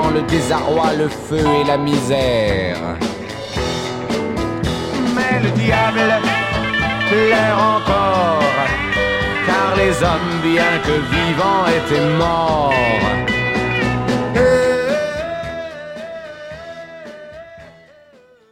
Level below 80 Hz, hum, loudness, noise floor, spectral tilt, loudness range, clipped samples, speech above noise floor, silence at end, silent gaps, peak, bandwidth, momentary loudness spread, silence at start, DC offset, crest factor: -34 dBFS; none; -16 LUFS; -48 dBFS; -5.5 dB/octave; 5 LU; under 0.1%; 33 dB; 0.8 s; none; -2 dBFS; 16.5 kHz; 14 LU; 0 s; under 0.1%; 16 dB